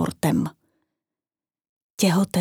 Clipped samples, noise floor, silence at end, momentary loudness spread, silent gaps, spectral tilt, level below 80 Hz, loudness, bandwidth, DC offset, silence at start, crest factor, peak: under 0.1%; under -90 dBFS; 0 s; 13 LU; 1.69-1.97 s; -5.5 dB/octave; -58 dBFS; -23 LUFS; 19 kHz; under 0.1%; 0 s; 18 dB; -8 dBFS